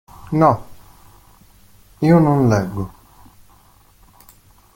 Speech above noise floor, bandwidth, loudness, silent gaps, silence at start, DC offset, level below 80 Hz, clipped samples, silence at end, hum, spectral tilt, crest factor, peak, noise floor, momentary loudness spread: 36 dB; 17 kHz; -17 LUFS; none; 0.25 s; under 0.1%; -46 dBFS; under 0.1%; 1.85 s; none; -8.5 dB/octave; 18 dB; -2 dBFS; -51 dBFS; 14 LU